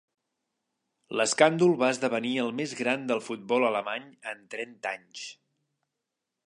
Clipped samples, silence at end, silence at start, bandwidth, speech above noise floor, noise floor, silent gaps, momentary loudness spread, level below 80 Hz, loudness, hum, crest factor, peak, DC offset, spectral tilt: under 0.1%; 1.15 s; 1.1 s; 11.5 kHz; 58 dB; -85 dBFS; none; 17 LU; -82 dBFS; -27 LUFS; none; 24 dB; -6 dBFS; under 0.1%; -4 dB/octave